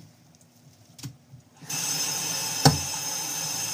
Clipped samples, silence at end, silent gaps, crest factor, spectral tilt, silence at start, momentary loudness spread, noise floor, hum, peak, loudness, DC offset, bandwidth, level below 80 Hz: under 0.1%; 0 s; none; 30 dB; -2.5 dB/octave; 0 s; 21 LU; -56 dBFS; none; 0 dBFS; -25 LUFS; under 0.1%; 16 kHz; -56 dBFS